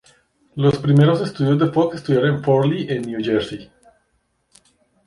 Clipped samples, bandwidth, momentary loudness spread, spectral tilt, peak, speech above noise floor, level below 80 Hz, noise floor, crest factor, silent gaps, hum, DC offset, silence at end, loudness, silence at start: under 0.1%; 11 kHz; 9 LU; -8 dB/octave; -4 dBFS; 50 dB; -54 dBFS; -67 dBFS; 16 dB; none; none; under 0.1%; 1.4 s; -18 LUFS; 0.55 s